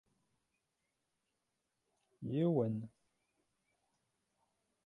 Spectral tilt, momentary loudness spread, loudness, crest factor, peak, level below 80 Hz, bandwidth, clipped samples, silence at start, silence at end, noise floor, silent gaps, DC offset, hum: -10.5 dB/octave; 16 LU; -37 LUFS; 22 dB; -22 dBFS; -80 dBFS; 4 kHz; under 0.1%; 2.2 s; 2 s; -86 dBFS; none; under 0.1%; none